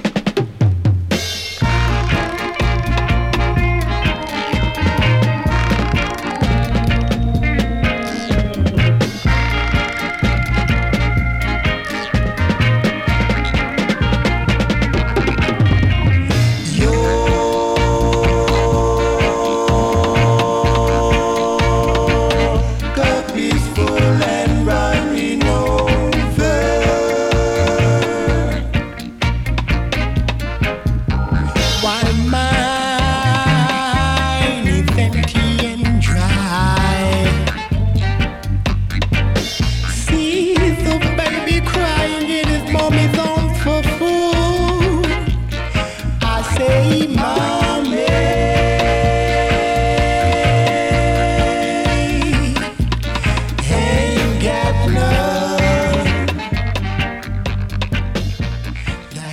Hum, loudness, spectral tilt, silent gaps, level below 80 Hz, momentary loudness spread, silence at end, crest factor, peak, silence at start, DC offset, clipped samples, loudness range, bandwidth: none; -16 LUFS; -5.5 dB/octave; none; -22 dBFS; 5 LU; 0 s; 10 dB; -6 dBFS; 0 s; under 0.1%; under 0.1%; 2 LU; 15 kHz